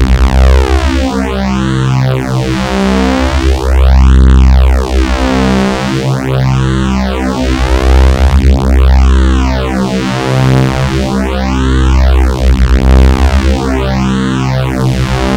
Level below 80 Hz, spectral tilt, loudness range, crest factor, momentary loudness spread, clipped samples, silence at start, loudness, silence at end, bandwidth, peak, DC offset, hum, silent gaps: -10 dBFS; -6.5 dB/octave; 2 LU; 8 dB; 5 LU; 0.3%; 0 s; -10 LUFS; 0 s; 10 kHz; 0 dBFS; 0.8%; none; none